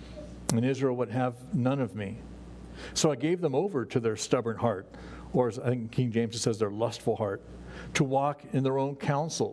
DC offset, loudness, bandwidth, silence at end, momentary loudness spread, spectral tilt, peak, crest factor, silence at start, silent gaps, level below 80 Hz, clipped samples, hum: under 0.1%; -30 LUFS; 11 kHz; 0 s; 16 LU; -5.5 dB/octave; -8 dBFS; 22 dB; 0 s; none; -54 dBFS; under 0.1%; none